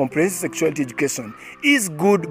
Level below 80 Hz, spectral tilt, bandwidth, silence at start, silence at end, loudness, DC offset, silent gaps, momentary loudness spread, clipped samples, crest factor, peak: -62 dBFS; -4 dB/octave; 16 kHz; 0 s; 0 s; -20 LUFS; under 0.1%; none; 7 LU; under 0.1%; 16 dB; -6 dBFS